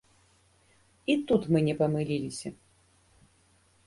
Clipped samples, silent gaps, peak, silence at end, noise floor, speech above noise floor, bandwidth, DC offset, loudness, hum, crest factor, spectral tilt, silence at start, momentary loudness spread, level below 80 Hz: under 0.1%; none; -12 dBFS; 1.35 s; -65 dBFS; 38 dB; 11.5 kHz; under 0.1%; -28 LUFS; none; 20 dB; -6.5 dB/octave; 1.1 s; 13 LU; -62 dBFS